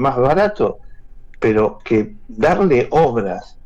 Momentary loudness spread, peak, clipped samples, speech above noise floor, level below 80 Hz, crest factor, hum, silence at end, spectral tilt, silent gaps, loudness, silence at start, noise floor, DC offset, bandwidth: 8 LU; -6 dBFS; under 0.1%; 20 dB; -38 dBFS; 10 dB; none; 0.2 s; -8 dB/octave; none; -17 LUFS; 0 s; -36 dBFS; under 0.1%; 8.2 kHz